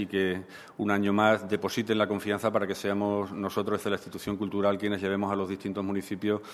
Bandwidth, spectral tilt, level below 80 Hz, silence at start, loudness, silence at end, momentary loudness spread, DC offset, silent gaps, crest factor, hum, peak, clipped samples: 14 kHz; -6 dB/octave; -64 dBFS; 0 s; -29 LUFS; 0 s; 8 LU; under 0.1%; none; 20 dB; none; -8 dBFS; under 0.1%